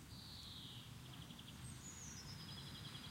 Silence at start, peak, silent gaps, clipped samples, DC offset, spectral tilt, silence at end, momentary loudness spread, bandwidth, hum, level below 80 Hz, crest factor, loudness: 0 s; -40 dBFS; none; under 0.1%; under 0.1%; -3 dB/octave; 0 s; 3 LU; 16.5 kHz; none; -68 dBFS; 14 dB; -53 LUFS